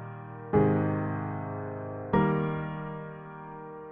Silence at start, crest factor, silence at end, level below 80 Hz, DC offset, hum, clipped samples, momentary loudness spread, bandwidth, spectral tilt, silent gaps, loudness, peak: 0 s; 18 dB; 0 s; -54 dBFS; under 0.1%; none; under 0.1%; 17 LU; 3.6 kHz; -11.5 dB/octave; none; -30 LUFS; -12 dBFS